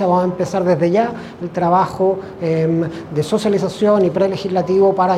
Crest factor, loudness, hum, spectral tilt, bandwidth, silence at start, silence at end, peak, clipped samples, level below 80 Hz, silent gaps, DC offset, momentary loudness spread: 14 dB; -17 LUFS; none; -7 dB/octave; 13 kHz; 0 s; 0 s; -2 dBFS; under 0.1%; -52 dBFS; none; under 0.1%; 8 LU